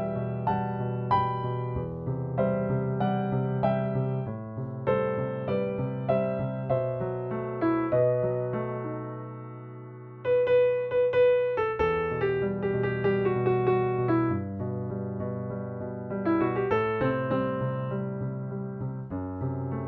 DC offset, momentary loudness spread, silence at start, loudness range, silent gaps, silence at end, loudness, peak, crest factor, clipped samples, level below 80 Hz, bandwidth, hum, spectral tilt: under 0.1%; 10 LU; 0 s; 4 LU; none; 0 s; -28 LUFS; -10 dBFS; 18 dB; under 0.1%; -54 dBFS; 4.6 kHz; none; -7.5 dB/octave